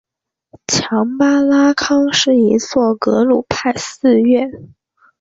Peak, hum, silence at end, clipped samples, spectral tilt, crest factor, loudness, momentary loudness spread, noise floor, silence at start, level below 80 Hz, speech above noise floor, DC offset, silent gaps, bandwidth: 0 dBFS; none; 0.55 s; under 0.1%; -4 dB/octave; 14 dB; -14 LUFS; 6 LU; -58 dBFS; 0.7 s; -50 dBFS; 45 dB; under 0.1%; none; 7.8 kHz